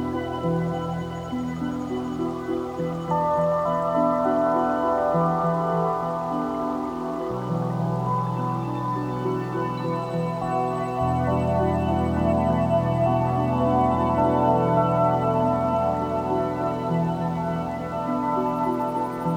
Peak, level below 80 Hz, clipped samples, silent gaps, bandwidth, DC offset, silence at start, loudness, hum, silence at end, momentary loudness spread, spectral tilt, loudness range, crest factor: -8 dBFS; -46 dBFS; under 0.1%; none; 13 kHz; under 0.1%; 0 s; -24 LUFS; none; 0 s; 7 LU; -8.5 dB/octave; 5 LU; 16 dB